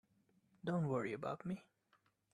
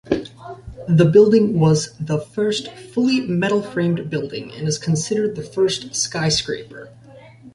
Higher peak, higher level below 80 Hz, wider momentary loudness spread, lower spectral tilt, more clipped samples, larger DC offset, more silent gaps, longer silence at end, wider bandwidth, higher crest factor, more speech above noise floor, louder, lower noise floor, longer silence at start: second, -26 dBFS vs -2 dBFS; second, -80 dBFS vs -50 dBFS; second, 10 LU vs 16 LU; first, -8 dB/octave vs -5.5 dB/octave; neither; neither; neither; first, 0.75 s vs 0.05 s; about the same, 10.5 kHz vs 11.5 kHz; about the same, 18 dB vs 18 dB; first, 37 dB vs 24 dB; second, -43 LUFS vs -19 LUFS; first, -78 dBFS vs -43 dBFS; first, 0.65 s vs 0.05 s